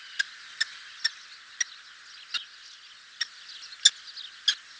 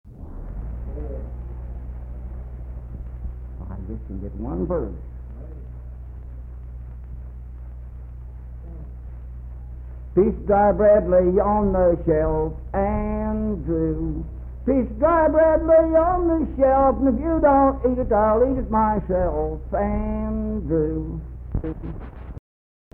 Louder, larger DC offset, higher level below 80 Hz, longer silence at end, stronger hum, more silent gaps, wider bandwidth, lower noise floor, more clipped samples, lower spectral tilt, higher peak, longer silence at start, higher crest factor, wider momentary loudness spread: second, -28 LUFS vs -21 LUFS; neither; second, -82 dBFS vs -32 dBFS; second, 0.2 s vs 0.55 s; neither; neither; first, 8 kHz vs 3.1 kHz; second, -50 dBFS vs under -90 dBFS; neither; second, 5.5 dB/octave vs -12.5 dB/octave; first, -2 dBFS vs -6 dBFS; about the same, 0 s vs 0.05 s; first, 32 dB vs 16 dB; about the same, 24 LU vs 22 LU